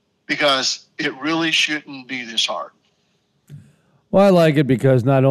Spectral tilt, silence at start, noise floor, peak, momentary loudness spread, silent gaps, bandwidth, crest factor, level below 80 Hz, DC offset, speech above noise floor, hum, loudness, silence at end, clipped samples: -5 dB/octave; 0.3 s; -65 dBFS; -2 dBFS; 13 LU; none; 14 kHz; 16 dB; -60 dBFS; under 0.1%; 48 dB; none; -17 LUFS; 0 s; under 0.1%